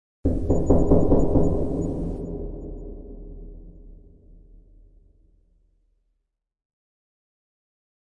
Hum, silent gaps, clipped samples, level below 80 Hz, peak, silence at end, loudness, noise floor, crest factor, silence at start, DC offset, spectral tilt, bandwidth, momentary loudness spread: none; none; under 0.1%; -32 dBFS; -4 dBFS; 4.2 s; -23 LUFS; -78 dBFS; 22 dB; 0.25 s; under 0.1%; -11 dB/octave; 7.4 kHz; 23 LU